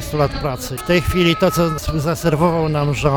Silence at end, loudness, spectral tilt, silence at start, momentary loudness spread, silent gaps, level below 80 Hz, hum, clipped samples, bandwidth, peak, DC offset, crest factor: 0 s; -18 LUFS; -5.5 dB/octave; 0 s; 7 LU; none; -32 dBFS; none; under 0.1%; 19 kHz; -4 dBFS; under 0.1%; 14 dB